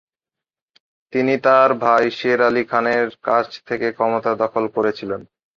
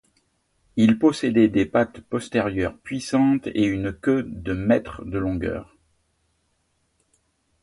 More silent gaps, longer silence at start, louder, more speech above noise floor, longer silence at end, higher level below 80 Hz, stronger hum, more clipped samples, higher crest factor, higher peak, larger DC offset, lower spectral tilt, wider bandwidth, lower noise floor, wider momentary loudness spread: neither; first, 1.15 s vs 0.75 s; first, -18 LUFS vs -22 LUFS; first, 70 dB vs 48 dB; second, 0.35 s vs 2 s; second, -62 dBFS vs -46 dBFS; neither; neither; about the same, 18 dB vs 18 dB; about the same, -2 dBFS vs -4 dBFS; neither; about the same, -6 dB/octave vs -6.5 dB/octave; second, 7.4 kHz vs 11.5 kHz; first, -88 dBFS vs -70 dBFS; about the same, 11 LU vs 11 LU